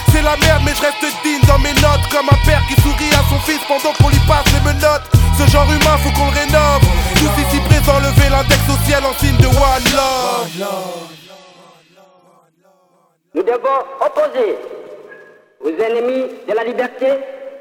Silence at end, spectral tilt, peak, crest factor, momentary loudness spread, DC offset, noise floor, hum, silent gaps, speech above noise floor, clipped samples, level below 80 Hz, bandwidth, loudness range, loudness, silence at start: 0 s; -5 dB/octave; 0 dBFS; 14 dB; 10 LU; under 0.1%; -57 dBFS; none; none; 44 dB; 0.2%; -20 dBFS; 19.5 kHz; 9 LU; -13 LUFS; 0 s